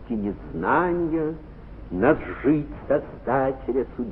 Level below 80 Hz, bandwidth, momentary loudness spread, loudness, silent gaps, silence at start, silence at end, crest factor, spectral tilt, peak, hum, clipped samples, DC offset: -42 dBFS; 4.2 kHz; 10 LU; -24 LUFS; none; 0 s; 0 s; 18 dB; -11.5 dB/octave; -6 dBFS; none; under 0.1%; under 0.1%